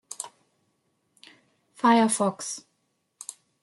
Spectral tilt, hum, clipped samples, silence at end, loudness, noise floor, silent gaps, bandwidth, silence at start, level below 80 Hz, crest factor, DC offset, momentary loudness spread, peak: -3.5 dB/octave; none; under 0.1%; 1.05 s; -23 LUFS; -74 dBFS; none; 12 kHz; 0.1 s; -78 dBFS; 20 dB; under 0.1%; 21 LU; -8 dBFS